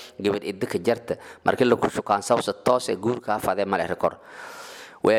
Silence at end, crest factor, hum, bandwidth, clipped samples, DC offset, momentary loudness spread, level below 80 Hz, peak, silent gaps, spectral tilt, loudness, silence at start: 0 s; 20 dB; none; 16.5 kHz; under 0.1%; under 0.1%; 17 LU; -60 dBFS; -4 dBFS; none; -5 dB/octave; -24 LUFS; 0 s